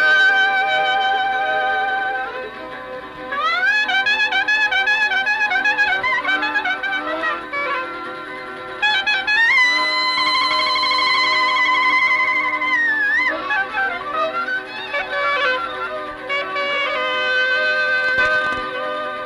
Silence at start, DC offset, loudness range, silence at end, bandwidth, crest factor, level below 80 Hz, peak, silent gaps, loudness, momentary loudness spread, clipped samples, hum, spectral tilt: 0 s; under 0.1%; 5 LU; 0 s; 13.5 kHz; 12 dB; -56 dBFS; -6 dBFS; none; -17 LUFS; 11 LU; under 0.1%; none; -1.5 dB/octave